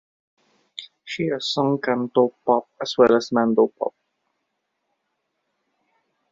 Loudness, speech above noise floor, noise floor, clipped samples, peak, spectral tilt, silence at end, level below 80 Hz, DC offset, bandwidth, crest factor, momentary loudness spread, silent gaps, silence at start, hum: -21 LUFS; 56 dB; -76 dBFS; under 0.1%; -2 dBFS; -5.5 dB/octave; 2.4 s; -68 dBFS; under 0.1%; 7.8 kHz; 20 dB; 19 LU; none; 0.8 s; none